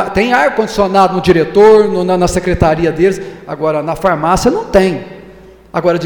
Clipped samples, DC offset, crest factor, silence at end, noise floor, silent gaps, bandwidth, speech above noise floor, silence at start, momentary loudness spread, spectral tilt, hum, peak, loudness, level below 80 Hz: under 0.1%; under 0.1%; 12 dB; 0 s; -37 dBFS; none; 19 kHz; 26 dB; 0 s; 10 LU; -6 dB/octave; none; 0 dBFS; -11 LUFS; -32 dBFS